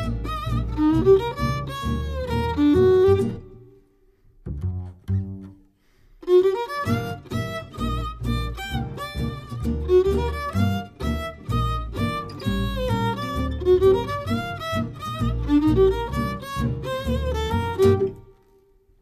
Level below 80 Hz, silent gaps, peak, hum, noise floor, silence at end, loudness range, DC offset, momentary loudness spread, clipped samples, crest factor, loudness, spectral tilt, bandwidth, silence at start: -34 dBFS; none; -6 dBFS; none; -57 dBFS; 0.8 s; 5 LU; under 0.1%; 12 LU; under 0.1%; 18 dB; -23 LUFS; -7.5 dB/octave; 15 kHz; 0 s